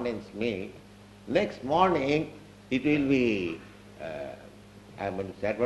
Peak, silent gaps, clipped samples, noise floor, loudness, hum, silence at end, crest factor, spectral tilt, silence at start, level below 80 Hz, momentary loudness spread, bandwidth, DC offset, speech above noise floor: -10 dBFS; none; under 0.1%; -50 dBFS; -29 LUFS; 50 Hz at -55 dBFS; 0 s; 20 dB; -6.5 dB/octave; 0 s; -56 dBFS; 20 LU; 12 kHz; under 0.1%; 22 dB